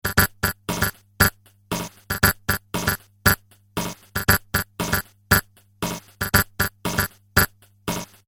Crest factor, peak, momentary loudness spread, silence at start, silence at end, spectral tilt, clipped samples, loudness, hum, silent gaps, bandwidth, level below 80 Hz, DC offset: 22 dB; -2 dBFS; 10 LU; 0.05 s; 0.2 s; -3.5 dB/octave; under 0.1%; -23 LUFS; none; none; over 20 kHz; -38 dBFS; under 0.1%